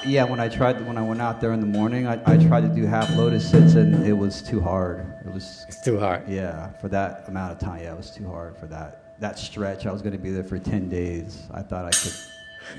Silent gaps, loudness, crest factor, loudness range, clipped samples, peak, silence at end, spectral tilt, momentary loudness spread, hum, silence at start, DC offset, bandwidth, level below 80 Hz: none; -22 LUFS; 20 dB; 13 LU; under 0.1%; -2 dBFS; 0 s; -6 dB/octave; 20 LU; none; 0 s; under 0.1%; 11 kHz; -46 dBFS